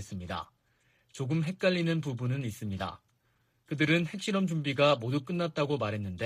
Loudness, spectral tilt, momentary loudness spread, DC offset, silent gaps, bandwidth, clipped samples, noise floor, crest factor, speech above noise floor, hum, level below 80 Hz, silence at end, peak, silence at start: -31 LUFS; -6 dB/octave; 13 LU; under 0.1%; none; 14.5 kHz; under 0.1%; -72 dBFS; 18 dB; 42 dB; none; -64 dBFS; 0 s; -14 dBFS; 0 s